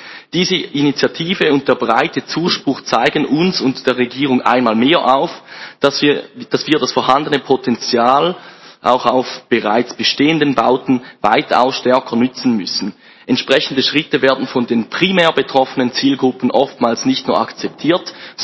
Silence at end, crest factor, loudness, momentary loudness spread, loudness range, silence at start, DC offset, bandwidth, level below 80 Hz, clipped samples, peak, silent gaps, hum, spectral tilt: 0 s; 14 dB; -15 LUFS; 6 LU; 1 LU; 0 s; under 0.1%; 8 kHz; -58 dBFS; 0.2%; 0 dBFS; none; none; -5 dB/octave